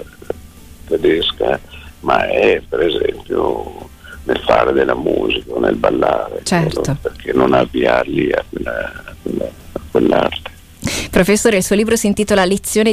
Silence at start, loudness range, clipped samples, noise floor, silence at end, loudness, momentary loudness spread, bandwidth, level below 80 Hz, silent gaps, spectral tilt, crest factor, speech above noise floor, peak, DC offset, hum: 0 s; 2 LU; under 0.1%; -37 dBFS; 0 s; -16 LUFS; 14 LU; 16 kHz; -36 dBFS; none; -4.5 dB/octave; 14 dB; 22 dB; -2 dBFS; under 0.1%; none